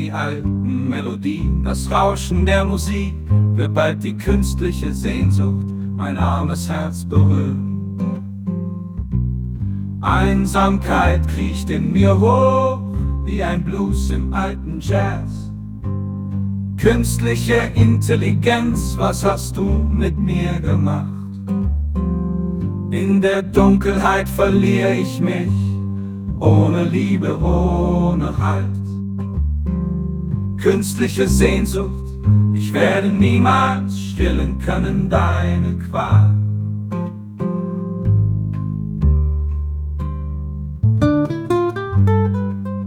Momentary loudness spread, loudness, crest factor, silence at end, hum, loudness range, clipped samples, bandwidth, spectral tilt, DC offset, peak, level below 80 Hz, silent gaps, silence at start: 10 LU; -18 LUFS; 16 dB; 0 s; none; 4 LU; under 0.1%; 16.5 kHz; -7 dB/octave; under 0.1%; 0 dBFS; -28 dBFS; none; 0 s